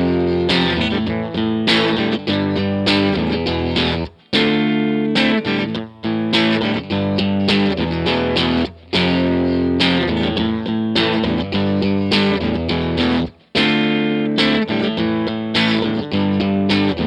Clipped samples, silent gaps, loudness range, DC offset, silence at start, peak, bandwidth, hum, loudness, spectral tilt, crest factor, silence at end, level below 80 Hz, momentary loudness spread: under 0.1%; none; 1 LU; under 0.1%; 0 s; 0 dBFS; 10.5 kHz; none; -17 LUFS; -6.5 dB/octave; 16 dB; 0 s; -40 dBFS; 5 LU